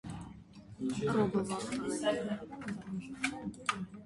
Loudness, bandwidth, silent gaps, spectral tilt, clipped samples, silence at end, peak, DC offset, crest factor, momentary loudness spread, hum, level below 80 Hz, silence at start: -36 LUFS; 11.5 kHz; none; -5 dB/octave; under 0.1%; 0 s; -16 dBFS; under 0.1%; 20 dB; 15 LU; none; -62 dBFS; 0.05 s